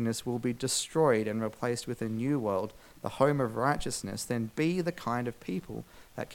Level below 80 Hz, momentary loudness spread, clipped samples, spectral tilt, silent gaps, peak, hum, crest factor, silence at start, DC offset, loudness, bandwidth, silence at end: -56 dBFS; 14 LU; under 0.1%; -5 dB/octave; none; -10 dBFS; none; 22 dB; 0 s; under 0.1%; -31 LUFS; 18 kHz; 0 s